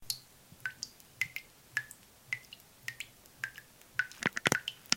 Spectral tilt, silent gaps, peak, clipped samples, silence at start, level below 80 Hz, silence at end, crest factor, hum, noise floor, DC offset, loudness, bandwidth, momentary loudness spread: -1.5 dB/octave; none; -4 dBFS; under 0.1%; 0 s; -70 dBFS; 0 s; 36 dB; none; -57 dBFS; under 0.1%; -38 LUFS; 17 kHz; 18 LU